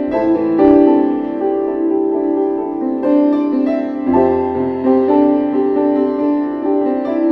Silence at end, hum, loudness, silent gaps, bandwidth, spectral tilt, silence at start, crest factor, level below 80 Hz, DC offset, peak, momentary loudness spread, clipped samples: 0 s; none; -15 LUFS; none; 5 kHz; -9.5 dB/octave; 0 s; 14 dB; -50 dBFS; under 0.1%; 0 dBFS; 7 LU; under 0.1%